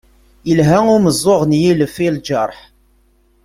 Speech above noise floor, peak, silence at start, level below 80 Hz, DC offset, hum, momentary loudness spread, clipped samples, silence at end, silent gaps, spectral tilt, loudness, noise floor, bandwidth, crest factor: 41 dB; 0 dBFS; 0.45 s; -44 dBFS; under 0.1%; none; 8 LU; under 0.1%; 0.9 s; none; -6 dB/octave; -14 LUFS; -54 dBFS; 16 kHz; 14 dB